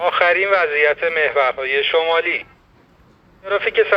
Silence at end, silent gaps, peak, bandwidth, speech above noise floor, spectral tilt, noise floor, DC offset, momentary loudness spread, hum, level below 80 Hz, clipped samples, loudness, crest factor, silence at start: 0 s; none; 0 dBFS; 6.2 kHz; 35 dB; -4 dB/octave; -52 dBFS; under 0.1%; 7 LU; none; -56 dBFS; under 0.1%; -17 LUFS; 18 dB; 0 s